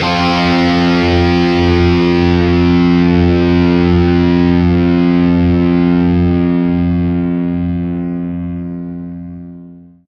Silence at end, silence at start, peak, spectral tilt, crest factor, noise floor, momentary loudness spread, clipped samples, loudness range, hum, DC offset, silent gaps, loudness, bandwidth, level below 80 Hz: 0.25 s; 0 s; 0 dBFS; -8 dB/octave; 12 dB; -36 dBFS; 12 LU; under 0.1%; 6 LU; none; under 0.1%; none; -12 LUFS; 6.6 kHz; -34 dBFS